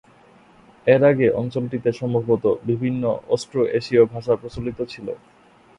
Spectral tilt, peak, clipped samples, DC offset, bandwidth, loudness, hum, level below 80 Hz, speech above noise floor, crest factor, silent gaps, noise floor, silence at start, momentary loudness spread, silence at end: -7.5 dB/octave; -2 dBFS; under 0.1%; under 0.1%; 10.5 kHz; -21 LUFS; none; -52 dBFS; 31 dB; 20 dB; none; -51 dBFS; 0.85 s; 13 LU; 0.6 s